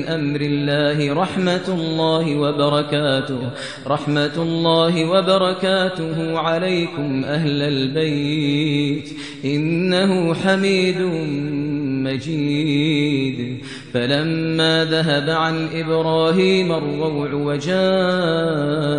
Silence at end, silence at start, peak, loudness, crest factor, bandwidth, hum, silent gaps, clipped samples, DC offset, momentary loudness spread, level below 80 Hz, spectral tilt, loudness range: 0 s; 0 s; -4 dBFS; -19 LUFS; 16 dB; 10.5 kHz; none; none; under 0.1%; 0.3%; 7 LU; -58 dBFS; -6 dB/octave; 2 LU